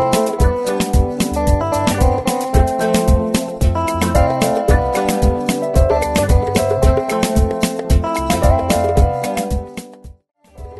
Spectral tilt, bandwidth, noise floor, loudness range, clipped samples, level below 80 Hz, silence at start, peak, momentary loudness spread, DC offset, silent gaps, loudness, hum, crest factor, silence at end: -6 dB/octave; 12.5 kHz; -38 dBFS; 1 LU; under 0.1%; -20 dBFS; 0 s; -2 dBFS; 4 LU; under 0.1%; none; -16 LUFS; none; 14 dB; 0 s